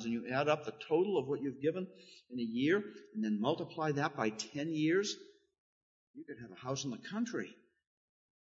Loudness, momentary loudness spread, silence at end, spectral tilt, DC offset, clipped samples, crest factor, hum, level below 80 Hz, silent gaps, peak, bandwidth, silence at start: -36 LUFS; 14 LU; 0.9 s; -4.5 dB/octave; under 0.1%; under 0.1%; 20 dB; none; -82 dBFS; 5.58-6.14 s; -18 dBFS; 7.4 kHz; 0 s